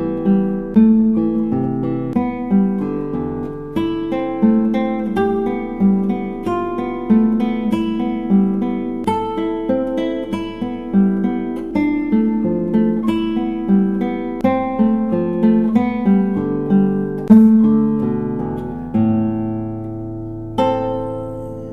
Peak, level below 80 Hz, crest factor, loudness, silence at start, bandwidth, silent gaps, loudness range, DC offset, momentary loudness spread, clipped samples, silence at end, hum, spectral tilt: 0 dBFS; -40 dBFS; 16 dB; -18 LUFS; 0 s; 4.2 kHz; none; 5 LU; under 0.1%; 9 LU; under 0.1%; 0 s; none; -9.5 dB/octave